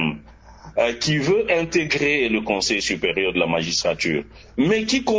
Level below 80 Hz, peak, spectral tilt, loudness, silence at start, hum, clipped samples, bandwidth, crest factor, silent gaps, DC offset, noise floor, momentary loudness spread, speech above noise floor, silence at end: -48 dBFS; -6 dBFS; -4 dB/octave; -21 LUFS; 0 s; none; under 0.1%; 8 kHz; 16 dB; none; under 0.1%; -44 dBFS; 6 LU; 23 dB; 0 s